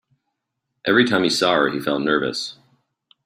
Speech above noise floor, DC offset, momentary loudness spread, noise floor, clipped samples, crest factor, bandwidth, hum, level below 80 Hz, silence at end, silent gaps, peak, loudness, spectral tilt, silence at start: 59 dB; under 0.1%; 12 LU; -78 dBFS; under 0.1%; 20 dB; 16 kHz; none; -62 dBFS; 0.7 s; none; -2 dBFS; -19 LUFS; -4 dB/octave; 0.85 s